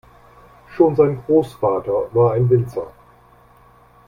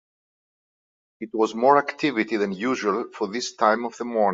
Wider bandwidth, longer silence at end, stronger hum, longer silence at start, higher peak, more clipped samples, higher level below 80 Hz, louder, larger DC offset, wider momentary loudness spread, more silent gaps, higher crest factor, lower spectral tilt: first, 14.5 kHz vs 7.8 kHz; first, 1.15 s vs 0 s; neither; second, 0.7 s vs 1.2 s; about the same, -2 dBFS vs -4 dBFS; neither; first, -50 dBFS vs -70 dBFS; first, -18 LUFS vs -23 LUFS; neither; first, 14 LU vs 9 LU; neither; about the same, 18 dB vs 20 dB; first, -10 dB/octave vs -4.5 dB/octave